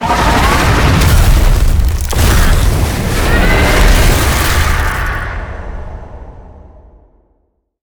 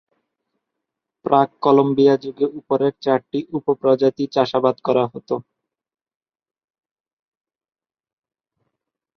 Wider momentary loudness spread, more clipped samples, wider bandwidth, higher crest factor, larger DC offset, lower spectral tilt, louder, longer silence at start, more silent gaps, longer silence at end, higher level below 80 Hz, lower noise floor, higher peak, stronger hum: first, 16 LU vs 10 LU; neither; first, over 20 kHz vs 6.4 kHz; second, 10 dB vs 20 dB; neither; second, -4.5 dB/octave vs -7.5 dB/octave; first, -12 LUFS vs -19 LUFS; second, 0 s vs 1.25 s; neither; second, 1.25 s vs 3.75 s; first, -14 dBFS vs -66 dBFS; second, -60 dBFS vs -82 dBFS; about the same, 0 dBFS vs -2 dBFS; neither